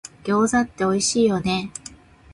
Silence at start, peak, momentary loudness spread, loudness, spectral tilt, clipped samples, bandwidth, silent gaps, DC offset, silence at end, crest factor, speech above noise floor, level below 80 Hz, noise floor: 0.05 s; -8 dBFS; 16 LU; -21 LUFS; -4 dB/octave; under 0.1%; 11.5 kHz; none; under 0.1%; 0.4 s; 14 dB; 24 dB; -50 dBFS; -44 dBFS